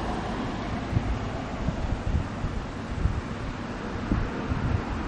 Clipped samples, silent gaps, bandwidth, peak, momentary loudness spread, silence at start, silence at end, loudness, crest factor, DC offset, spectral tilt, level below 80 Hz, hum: under 0.1%; none; 9.4 kHz; -10 dBFS; 5 LU; 0 s; 0 s; -31 LUFS; 18 dB; under 0.1%; -7 dB/octave; -34 dBFS; none